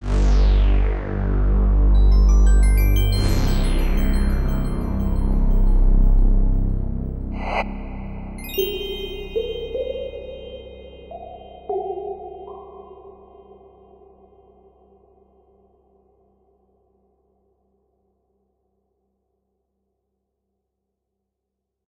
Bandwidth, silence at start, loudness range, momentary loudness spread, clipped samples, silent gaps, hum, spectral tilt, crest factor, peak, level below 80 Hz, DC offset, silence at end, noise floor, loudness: 16 kHz; 0 s; 15 LU; 20 LU; under 0.1%; none; none; -6.5 dB/octave; 14 dB; -6 dBFS; -20 dBFS; under 0.1%; 8.75 s; -81 dBFS; -22 LUFS